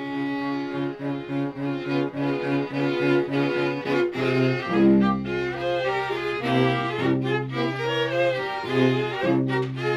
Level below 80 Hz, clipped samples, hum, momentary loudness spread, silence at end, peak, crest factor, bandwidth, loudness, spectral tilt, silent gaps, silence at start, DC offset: -56 dBFS; under 0.1%; none; 7 LU; 0 s; -8 dBFS; 16 dB; 11.5 kHz; -24 LUFS; -7.5 dB/octave; none; 0 s; under 0.1%